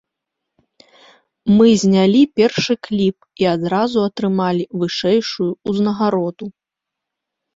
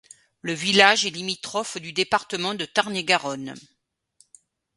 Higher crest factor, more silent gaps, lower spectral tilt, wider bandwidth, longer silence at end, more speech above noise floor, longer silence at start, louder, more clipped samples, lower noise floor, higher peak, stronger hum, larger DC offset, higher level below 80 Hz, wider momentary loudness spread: second, 16 dB vs 26 dB; neither; first, -6 dB/octave vs -2.5 dB/octave; second, 7.8 kHz vs 11.5 kHz; about the same, 1.05 s vs 1.15 s; first, 67 dB vs 39 dB; first, 1.45 s vs 0.45 s; first, -17 LUFS vs -22 LUFS; neither; first, -82 dBFS vs -63 dBFS; about the same, -2 dBFS vs 0 dBFS; neither; neither; first, -56 dBFS vs -68 dBFS; second, 9 LU vs 16 LU